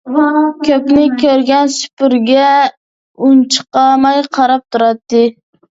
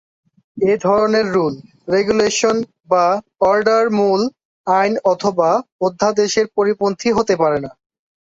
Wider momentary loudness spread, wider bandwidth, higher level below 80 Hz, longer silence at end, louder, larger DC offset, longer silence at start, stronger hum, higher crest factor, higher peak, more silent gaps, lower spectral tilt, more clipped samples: second, 4 LU vs 7 LU; about the same, 8 kHz vs 8 kHz; about the same, -52 dBFS vs -54 dBFS; second, 0.45 s vs 0.6 s; first, -11 LUFS vs -16 LUFS; neither; second, 0.05 s vs 0.55 s; neither; about the same, 12 dB vs 14 dB; about the same, 0 dBFS vs -2 dBFS; first, 1.93-1.97 s, 2.77-3.14 s vs 4.45-4.64 s, 5.72-5.79 s; about the same, -3.5 dB/octave vs -4.5 dB/octave; neither